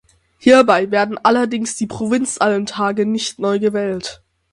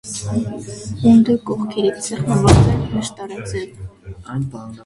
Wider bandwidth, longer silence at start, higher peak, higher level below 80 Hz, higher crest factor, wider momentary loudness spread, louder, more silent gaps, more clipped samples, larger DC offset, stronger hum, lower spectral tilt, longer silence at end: about the same, 11.5 kHz vs 11.5 kHz; first, 0.45 s vs 0.05 s; about the same, 0 dBFS vs 0 dBFS; second, -56 dBFS vs -32 dBFS; about the same, 16 dB vs 18 dB; second, 11 LU vs 18 LU; about the same, -16 LUFS vs -17 LUFS; neither; neither; neither; neither; second, -4 dB/octave vs -6.5 dB/octave; first, 0.4 s vs 0.05 s